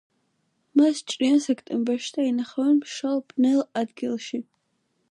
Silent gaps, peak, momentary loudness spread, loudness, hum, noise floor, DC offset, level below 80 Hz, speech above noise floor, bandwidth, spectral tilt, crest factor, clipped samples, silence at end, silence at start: none; -8 dBFS; 8 LU; -24 LUFS; none; -72 dBFS; under 0.1%; -78 dBFS; 49 dB; 11 kHz; -4 dB/octave; 18 dB; under 0.1%; 0.7 s; 0.75 s